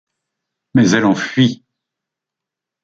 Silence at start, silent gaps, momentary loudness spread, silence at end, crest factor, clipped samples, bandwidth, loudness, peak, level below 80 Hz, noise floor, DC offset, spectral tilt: 0.75 s; none; 6 LU; 1.3 s; 16 dB; under 0.1%; 7.8 kHz; -15 LUFS; -2 dBFS; -58 dBFS; -84 dBFS; under 0.1%; -5.5 dB/octave